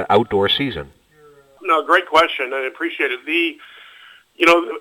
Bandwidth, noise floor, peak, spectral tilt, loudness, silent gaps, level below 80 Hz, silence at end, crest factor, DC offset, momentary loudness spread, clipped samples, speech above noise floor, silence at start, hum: 18.5 kHz; -50 dBFS; -2 dBFS; -4.5 dB/octave; -17 LUFS; none; -52 dBFS; 0 s; 16 dB; under 0.1%; 10 LU; under 0.1%; 32 dB; 0 s; none